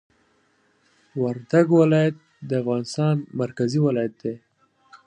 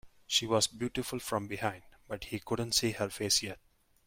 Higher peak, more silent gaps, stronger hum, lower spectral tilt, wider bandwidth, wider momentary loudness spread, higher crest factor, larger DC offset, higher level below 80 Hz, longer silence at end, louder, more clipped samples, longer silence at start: first, -4 dBFS vs -14 dBFS; neither; neither; first, -7.5 dB/octave vs -3 dB/octave; second, 10 kHz vs 16.5 kHz; about the same, 16 LU vs 14 LU; about the same, 18 dB vs 20 dB; neither; second, -68 dBFS vs -60 dBFS; second, 0.1 s vs 0.5 s; first, -22 LUFS vs -32 LUFS; neither; first, 1.15 s vs 0.05 s